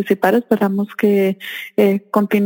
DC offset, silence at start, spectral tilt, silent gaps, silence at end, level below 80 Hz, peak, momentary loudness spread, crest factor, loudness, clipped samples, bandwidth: under 0.1%; 0 s; -7 dB/octave; none; 0 s; -64 dBFS; 0 dBFS; 5 LU; 16 dB; -17 LUFS; under 0.1%; 17 kHz